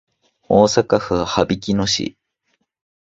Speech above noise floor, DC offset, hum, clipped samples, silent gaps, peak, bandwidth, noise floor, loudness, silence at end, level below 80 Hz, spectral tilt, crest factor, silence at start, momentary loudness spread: 53 dB; under 0.1%; none; under 0.1%; none; 0 dBFS; 8 kHz; -69 dBFS; -17 LUFS; 0.95 s; -44 dBFS; -4.5 dB/octave; 20 dB; 0.5 s; 6 LU